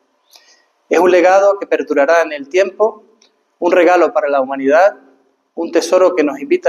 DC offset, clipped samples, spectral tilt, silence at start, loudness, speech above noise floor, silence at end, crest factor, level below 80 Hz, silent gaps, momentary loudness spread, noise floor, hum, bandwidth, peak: under 0.1%; under 0.1%; -3.5 dB/octave; 0.9 s; -13 LUFS; 42 dB; 0 s; 14 dB; -68 dBFS; none; 8 LU; -55 dBFS; none; 13 kHz; 0 dBFS